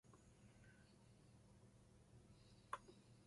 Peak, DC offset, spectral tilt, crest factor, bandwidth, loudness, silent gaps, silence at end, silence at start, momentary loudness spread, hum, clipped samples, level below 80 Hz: -32 dBFS; under 0.1%; -4.5 dB/octave; 32 dB; 11.5 kHz; -63 LUFS; none; 0 s; 0.05 s; 14 LU; none; under 0.1%; -78 dBFS